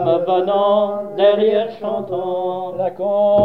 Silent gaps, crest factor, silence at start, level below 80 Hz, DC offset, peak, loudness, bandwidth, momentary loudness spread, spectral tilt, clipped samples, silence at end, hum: none; 14 dB; 0 s; -58 dBFS; 0.4%; -2 dBFS; -18 LUFS; 4.6 kHz; 8 LU; -8 dB/octave; under 0.1%; 0 s; none